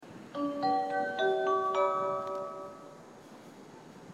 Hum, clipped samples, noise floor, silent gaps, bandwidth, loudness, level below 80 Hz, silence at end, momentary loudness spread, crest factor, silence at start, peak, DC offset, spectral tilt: none; under 0.1%; -51 dBFS; none; 12 kHz; -32 LUFS; -76 dBFS; 0 s; 22 LU; 16 dB; 0 s; -18 dBFS; under 0.1%; -5 dB/octave